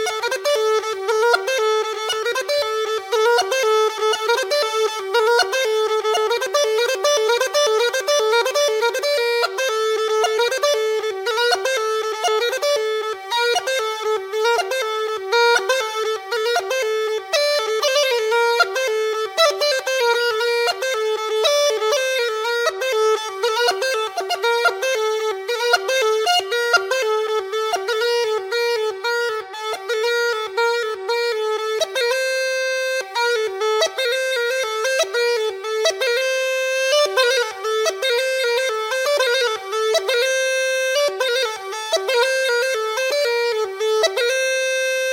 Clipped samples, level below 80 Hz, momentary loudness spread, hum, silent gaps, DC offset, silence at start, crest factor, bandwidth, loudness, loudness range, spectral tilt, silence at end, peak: under 0.1%; -76 dBFS; 5 LU; none; none; under 0.1%; 0 s; 18 dB; 17 kHz; -19 LUFS; 2 LU; 1.5 dB/octave; 0 s; -2 dBFS